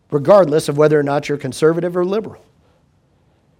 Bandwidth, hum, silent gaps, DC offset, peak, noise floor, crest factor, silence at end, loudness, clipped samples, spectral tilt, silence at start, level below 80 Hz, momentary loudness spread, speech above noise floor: 16 kHz; none; none; under 0.1%; 0 dBFS; -57 dBFS; 16 dB; 1.25 s; -15 LUFS; under 0.1%; -6.5 dB/octave; 0.1 s; -58 dBFS; 11 LU; 42 dB